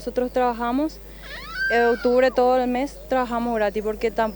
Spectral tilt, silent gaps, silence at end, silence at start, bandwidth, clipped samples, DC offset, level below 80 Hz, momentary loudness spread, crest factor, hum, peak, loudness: -5 dB/octave; none; 0 s; 0 s; over 20 kHz; under 0.1%; under 0.1%; -44 dBFS; 11 LU; 14 dB; none; -8 dBFS; -22 LUFS